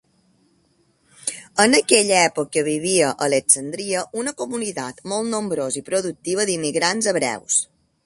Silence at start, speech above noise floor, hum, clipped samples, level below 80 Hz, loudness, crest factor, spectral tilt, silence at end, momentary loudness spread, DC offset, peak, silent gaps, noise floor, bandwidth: 1.2 s; 42 dB; none; under 0.1%; -64 dBFS; -20 LUFS; 22 dB; -2.5 dB/octave; 0.4 s; 11 LU; under 0.1%; 0 dBFS; none; -62 dBFS; 12 kHz